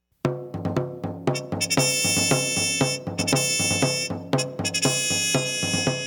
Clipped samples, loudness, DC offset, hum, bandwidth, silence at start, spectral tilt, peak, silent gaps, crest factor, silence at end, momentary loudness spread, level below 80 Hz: under 0.1%; -23 LUFS; under 0.1%; none; 19 kHz; 0.25 s; -3 dB/octave; -6 dBFS; none; 18 dB; 0 s; 9 LU; -56 dBFS